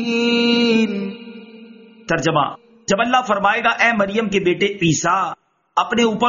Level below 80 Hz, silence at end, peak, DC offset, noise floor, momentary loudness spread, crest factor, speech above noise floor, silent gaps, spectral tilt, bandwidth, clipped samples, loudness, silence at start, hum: -54 dBFS; 0 s; 0 dBFS; under 0.1%; -42 dBFS; 13 LU; 18 dB; 25 dB; none; -3 dB/octave; 7.4 kHz; under 0.1%; -17 LUFS; 0 s; none